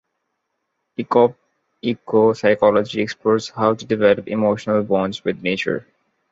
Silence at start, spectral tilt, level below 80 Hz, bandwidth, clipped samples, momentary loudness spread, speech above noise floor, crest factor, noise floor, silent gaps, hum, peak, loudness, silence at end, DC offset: 1 s; -6 dB/octave; -58 dBFS; 7.8 kHz; under 0.1%; 10 LU; 57 dB; 18 dB; -75 dBFS; none; none; -2 dBFS; -19 LUFS; 0.5 s; under 0.1%